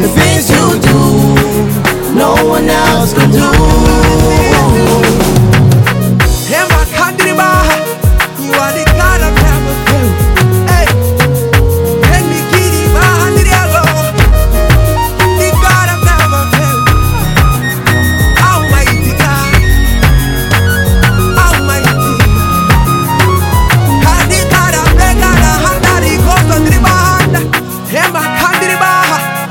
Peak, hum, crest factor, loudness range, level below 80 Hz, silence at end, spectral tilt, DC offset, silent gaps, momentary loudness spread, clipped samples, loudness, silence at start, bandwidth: 0 dBFS; none; 8 dB; 1 LU; -14 dBFS; 0 s; -5 dB/octave; under 0.1%; none; 3 LU; 0.5%; -8 LUFS; 0 s; 18 kHz